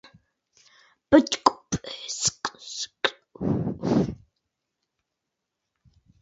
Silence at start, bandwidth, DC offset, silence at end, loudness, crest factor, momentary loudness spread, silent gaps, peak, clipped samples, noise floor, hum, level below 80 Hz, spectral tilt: 1.1 s; 8 kHz; under 0.1%; 2.1 s; -25 LUFS; 26 dB; 13 LU; none; -2 dBFS; under 0.1%; -83 dBFS; none; -52 dBFS; -4 dB/octave